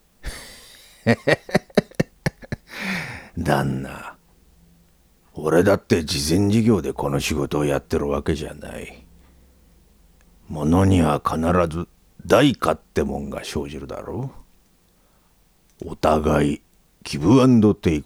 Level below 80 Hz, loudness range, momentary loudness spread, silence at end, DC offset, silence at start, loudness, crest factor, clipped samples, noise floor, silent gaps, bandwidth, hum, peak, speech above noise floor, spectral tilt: -40 dBFS; 7 LU; 19 LU; 0 s; under 0.1%; 0.25 s; -21 LUFS; 20 dB; under 0.1%; -59 dBFS; none; 17.5 kHz; none; -2 dBFS; 39 dB; -6 dB/octave